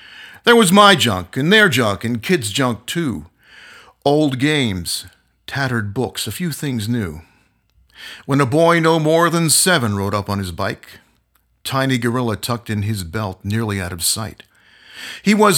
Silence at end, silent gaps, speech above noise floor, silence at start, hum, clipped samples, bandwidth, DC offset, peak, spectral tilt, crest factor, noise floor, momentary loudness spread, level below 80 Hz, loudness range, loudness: 0 s; none; 45 dB; 0.1 s; none; under 0.1%; 18 kHz; under 0.1%; 0 dBFS; -4 dB/octave; 18 dB; -62 dBFS; 13 LU; -50 dBFS; 7 LU; -17 LUFS